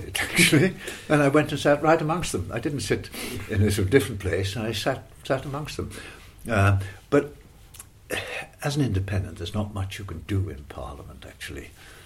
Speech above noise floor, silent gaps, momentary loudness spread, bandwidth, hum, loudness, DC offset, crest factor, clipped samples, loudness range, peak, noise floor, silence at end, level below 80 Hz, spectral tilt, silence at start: 22 dB; none; 19 LU; 16 kHz; none; -25 LUFS; under 0.1%; 22 dB; under 0.1%; 7 LU; -4 dBFS; -47 dBFS; 0 s; -46 dBFS; -5 dB/octave; 0 s